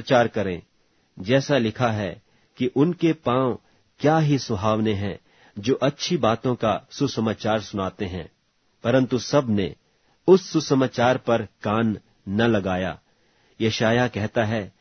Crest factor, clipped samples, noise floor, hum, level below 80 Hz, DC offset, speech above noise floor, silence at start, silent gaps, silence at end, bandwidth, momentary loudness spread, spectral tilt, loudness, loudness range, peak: 20 dB; under 0.1%; -62 dBFS; none; -56 dBFS; under 0.1%; 40 dB; 0 s; none; 0.1 s; 6.6 kHz; 11 LU; -6 dB/octave; -23 LUFS; 3 LU; -4 dBFS